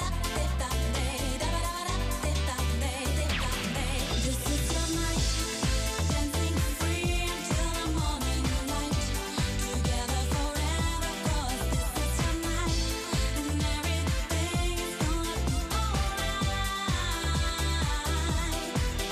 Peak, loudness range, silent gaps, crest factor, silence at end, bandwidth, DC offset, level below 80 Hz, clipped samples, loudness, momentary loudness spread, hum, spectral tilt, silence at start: -16 dBFS; 1 LU; none; 12 dB; 0 s; 15.5 kHz; under 0.1%; -32 dBFS; under 0.1%; -30 LUFS; 2 LU; none; -4 dB/octave; 0 s